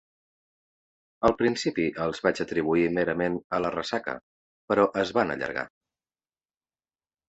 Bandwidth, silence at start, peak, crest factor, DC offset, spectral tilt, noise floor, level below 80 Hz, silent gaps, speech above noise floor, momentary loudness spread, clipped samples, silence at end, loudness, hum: 8.2 kHz; 1.2 s; -6 dBFS; 24 dB; under 0.1%; -5.5 dB/octave; under -90 dBFS; -56 dBFS; 3.44-3.50 s, 4.23-4.68 s; over 64 dB; 8 LU; under 0.1%; 1.6 s; -27 LUFS; none